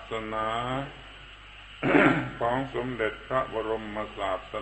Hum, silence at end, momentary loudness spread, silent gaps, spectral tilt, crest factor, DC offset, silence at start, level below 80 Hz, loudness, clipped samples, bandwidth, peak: none; 0 s; 23 LU; none; -6.5 dB/octave; 24 dB; under 0.1%; 0 s; -50 dBFS; -28 LUFS; under 0.1%; 8.6 kHz; -6 dBFS